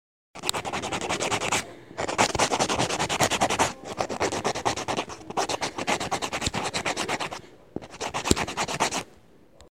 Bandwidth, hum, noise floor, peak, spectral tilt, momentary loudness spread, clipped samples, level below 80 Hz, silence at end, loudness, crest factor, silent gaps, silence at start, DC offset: 16 kHz; none; -55 dBFS; 0 dBFS; -2.5 dB/octave; 10 LU; under 0.1%; -48 dBFS; 0.05 s; -27 LUFS; 28 dB; none; 0.35 s; 0.2%